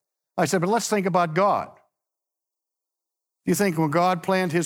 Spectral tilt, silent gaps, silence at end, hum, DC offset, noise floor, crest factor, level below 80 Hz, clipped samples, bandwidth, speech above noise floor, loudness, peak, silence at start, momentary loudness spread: -5 dB/octave; none; 0 s; none; under 0.1%; -87 dBFS; 18 dB; -70 dBFS; under 0.1%; 18.5 kHz; 65 dB; -23 LUFS; -6 dBFS; 0.35 s; 7 LU